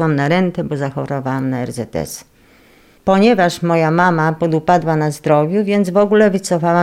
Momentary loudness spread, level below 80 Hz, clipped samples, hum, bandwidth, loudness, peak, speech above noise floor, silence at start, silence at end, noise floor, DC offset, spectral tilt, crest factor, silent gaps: 11 LU; -50 dBFS; under 0.1%; none; 15.5 kHz; -15 LUFS; -2 dBFS; 34 dB; 0 s; 0 s; -48 dBFS; under 0.1%; -6.5 dB/octave; 14 dB; none